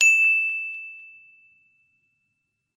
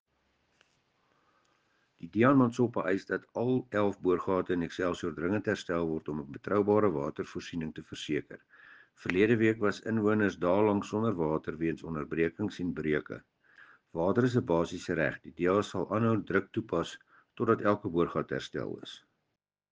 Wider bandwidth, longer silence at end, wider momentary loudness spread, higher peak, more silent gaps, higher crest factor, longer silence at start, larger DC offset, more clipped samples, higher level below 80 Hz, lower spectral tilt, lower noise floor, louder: first, 14.5 kHz vs 9.4 kHz; first, 1.7 s vs 0.75 s; first, 23 LU vs 12 LU; first, -6 dBFS vs -10 dBFS; neither; about the same, 20 dB vs 20 dB; second, 0 s vs 2.05 s; neither; neither; second, -88 dBFS vs -62 dBFS; second, 5 dB/octave vs -7 dB/octave; second, -77 dBFS vs -85 dBFS; first, -19 LUFS vs -31 LUFS